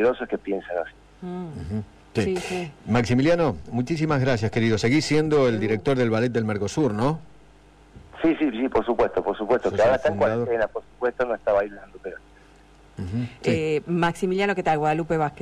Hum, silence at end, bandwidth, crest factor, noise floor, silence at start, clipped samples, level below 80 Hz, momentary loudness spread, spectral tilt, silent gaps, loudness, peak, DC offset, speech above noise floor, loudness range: none; 0 s; 13 kHz; 12 dB; -52 dBFS; 0 s; under 0.1%; -48 dBFS; 13 LU; -6.5 dB/octave; none; -24 LUFS; -12 dBFS; under 0.1%; 29 dB; 5 LU